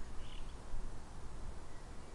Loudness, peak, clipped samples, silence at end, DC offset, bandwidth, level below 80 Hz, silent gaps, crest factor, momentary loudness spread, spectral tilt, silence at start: -52 LUFS; -28 dBFS; under 0.1%; 0 s; under 0.1%; 11 kHz; -46 dBFS; none; 12 dB; 3 LU; -5 dB/octave; 0 s